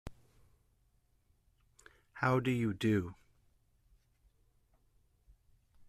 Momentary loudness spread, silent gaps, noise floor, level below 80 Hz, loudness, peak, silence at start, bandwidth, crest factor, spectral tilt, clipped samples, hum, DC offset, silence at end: 14 LU; none; -73 dBFS; -64 dBFS; -33 LUFS; -18 dBFS; 0.05 s; 14 kHz; 22 dB; -7 dB/octave; under 0.1%; none; under 0.1%; 2.75 s